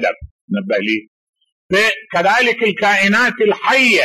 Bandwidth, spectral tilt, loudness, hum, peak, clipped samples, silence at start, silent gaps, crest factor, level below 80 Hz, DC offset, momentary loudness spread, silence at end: 13.5 kHz; -3.5 dB/octave; -14 LUFS; none; -4 dBFS; under 0.1%; 0 s; 0.31-0.48 s, 1.08-1.33 s, 1.52-1.69 s; 12 dB; -50 dBFS; under 0.1%; 10 LU; 0 s